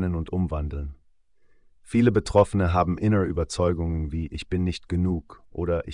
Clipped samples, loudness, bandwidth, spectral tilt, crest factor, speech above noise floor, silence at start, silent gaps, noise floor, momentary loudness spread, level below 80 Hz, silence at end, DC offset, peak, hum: under 0.1%; -25 LUFS; 10.5 kHz; -7.5 dB/octave; 18 dB; 34 dB; 0 s; none; -58 dBFS; 11 LU; -40 dBFS; 0 s; under 0.1%; -6 dBFS; none